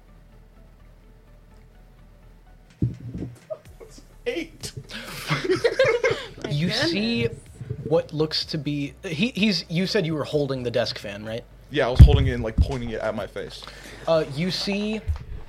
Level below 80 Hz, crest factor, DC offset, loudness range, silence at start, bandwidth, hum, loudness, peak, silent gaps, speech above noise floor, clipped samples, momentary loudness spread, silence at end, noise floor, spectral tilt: -30 dBFS; 24 dB; under 0.1%; 15 LU; 0.6 s; 14 kHz; none; -24 LUFS; 0 dBFS; none; 28 dB; under 0.1%; 15 LU; 0 s; -50 dBFS; -6 dB/octave